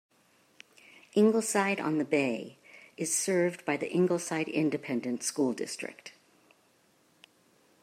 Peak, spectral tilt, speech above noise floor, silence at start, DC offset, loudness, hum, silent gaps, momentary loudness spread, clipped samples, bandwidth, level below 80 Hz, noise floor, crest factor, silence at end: -12 dBFS; -4.5 dB/octave; 37 dB; 1.15 s; under 0.1%; -30 LUFS; none; none; 13 LU; under 0.1%; 16 kHz; -82 dBFS; -67 dBFS; 20 dB; 1.75 s